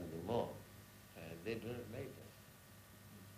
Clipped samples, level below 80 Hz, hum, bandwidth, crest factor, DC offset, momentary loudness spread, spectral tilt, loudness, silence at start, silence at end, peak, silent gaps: under 0.1%; -70 dBFS; none; 15.5 kHz; 20 dB; under 0.1%; 18 LU; -6 dB/octave; -46 LUFS; 0 s; 0 s; -26 dBFS; none